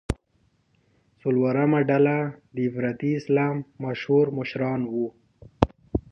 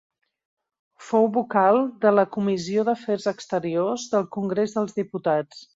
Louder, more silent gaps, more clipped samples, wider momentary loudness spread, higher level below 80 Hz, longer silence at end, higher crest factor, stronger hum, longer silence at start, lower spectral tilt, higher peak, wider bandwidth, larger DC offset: about the same, -25 LUFS vs -23 LUFS; neither; neither; first, 11 LU vs 7 LU; first, -44 dBFS vs -68 dBFS; about the same, 0.1 s vs 0.1 s; first, 24 dB vs 18 dB; neither; second, 0.1 s vs 1 s; first, -8.5 dB/octave vs -6 dB/octave; first, 0 dBFS vs -6 dBFS; first, 11 kHz vs 7.8 kHz; neither